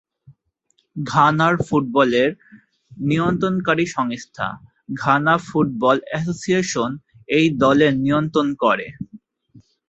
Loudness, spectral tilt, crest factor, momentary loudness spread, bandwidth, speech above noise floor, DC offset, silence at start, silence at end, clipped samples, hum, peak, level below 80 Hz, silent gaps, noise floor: -19 LUFS; -6 dB/octave; 18 dB; 12 LU; 8.2 kHz; 48 dB; under 0.1%; 0.3 s; 0.3 s; under 0.1%; none; -2 dBFS; -54 dBFS; none; -67 dBFS